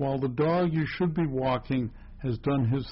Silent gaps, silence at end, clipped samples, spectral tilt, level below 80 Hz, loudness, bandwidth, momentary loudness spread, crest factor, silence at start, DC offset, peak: none; 0 s; under 0.1%; -7 dB/octave; -48 dBFS; -28 LUFS; 5.8 kHz; 7 LU; 12 dB; 0 s; under 0.1%; -16 dBFS